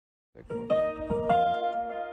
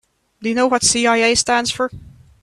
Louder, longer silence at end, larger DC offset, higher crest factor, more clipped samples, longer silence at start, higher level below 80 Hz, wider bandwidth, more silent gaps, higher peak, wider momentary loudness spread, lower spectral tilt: second, -28 LUFS vs -16 LUFS; second, 0 s vs 0.35 s; neither; about the same, 14 dB vs 18 dB; neither; about the same, 0.35 s vs 0.4 s; about the same, -52 dBFS vs -48 dBFS; second, 9 kHz vs 13 kHz; neither; second, -14 dBFS vs 0 dBFS; about the same, 11 LU vs 10 LU; first, -7.5 dB/octave vs -2 dB/octave